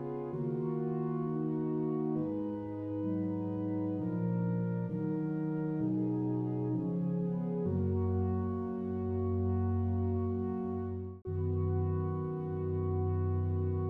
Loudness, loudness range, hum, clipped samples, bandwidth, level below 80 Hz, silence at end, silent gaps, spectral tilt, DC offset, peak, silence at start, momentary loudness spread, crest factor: -34 LUFS; 1 LU; none; under 0.1%; 3.1 kHz; -58 dBFS; 0 s; none; -12.5 dB/octave; under 0.1%; -22 dBFS; 0 s; 4 LU; 10 dB